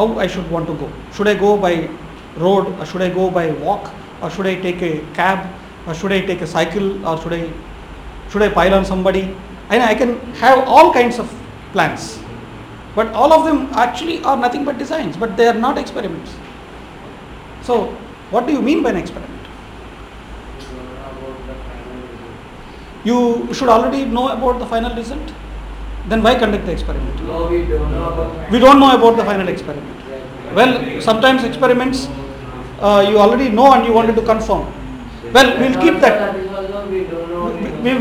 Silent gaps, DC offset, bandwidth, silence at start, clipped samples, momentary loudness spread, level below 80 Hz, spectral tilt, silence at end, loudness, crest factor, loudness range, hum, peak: none; under 0.1%; 16 kHz; 0 s; under 0.1%; 22 LU; -32 dBFS; -5.5 dB/octave; 0 s; -15 LUFS; 16 dB; 8 LU; none; 0 dBFS